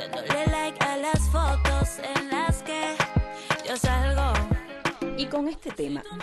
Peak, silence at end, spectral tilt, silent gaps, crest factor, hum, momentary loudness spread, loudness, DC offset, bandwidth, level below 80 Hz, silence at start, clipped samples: -12 dBFS; 0 s; -5 dB/octave; none; 14 dB; none; 7 LU; -27 LUFS; under 0.1%; 12.5 kHz; -30 dBFS; 0 s; under 0.1%